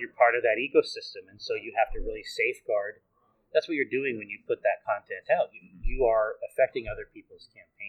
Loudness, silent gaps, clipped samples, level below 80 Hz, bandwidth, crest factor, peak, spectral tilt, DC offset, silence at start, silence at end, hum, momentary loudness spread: -28 LUFS; none; under 0.1%; -42 dBFS; 13.5 kHz; 20 dB; -8 dBFS; -5 dB/octave; under 0.1%; 0 s; 0 s; none; 15 LU